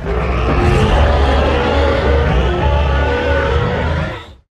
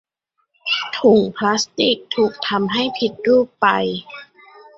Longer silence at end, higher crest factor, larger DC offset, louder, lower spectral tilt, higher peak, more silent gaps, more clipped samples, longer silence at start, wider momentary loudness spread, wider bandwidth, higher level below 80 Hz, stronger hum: second, 0.25 s vs 0.55 s; second, 12 dB vs 18 dB; neither; first, -15 LUFS vs -18 LUFS; first, -7 dB/octave vs -4 dB/octave; about the same, 0 dBFS vs -2 dBFS; neither; neither; second, 0 s vs 0.65 s; second, 5 LU vs 11 LU; first, 9.2 kHz vs 7.8 kHz; first, -18 dBFS vs -60 dBFS; neither